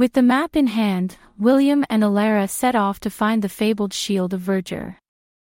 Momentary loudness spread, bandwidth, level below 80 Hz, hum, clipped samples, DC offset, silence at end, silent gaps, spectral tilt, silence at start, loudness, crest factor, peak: 8 LU; 16.5 kHz; -54 dBFS; none; under 0.1%; under 0.1%; 0.6 s; none; -5.5 dB/octave; 0 s; -20 LUFS; 14 dB; -4 dBFS